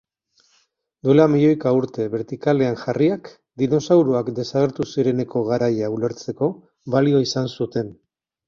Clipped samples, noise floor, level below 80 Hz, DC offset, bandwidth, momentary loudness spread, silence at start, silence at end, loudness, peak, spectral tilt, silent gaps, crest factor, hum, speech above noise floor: under 0.1%; -64 dBFS; -60 dBFS; under 0.1%; 7.4 kHz; 9 LU; 1.05 s; 0.55 s; -20 LUFS; -2 dBFS; -7 dB/octave; none; 18 dB; none; 45 dB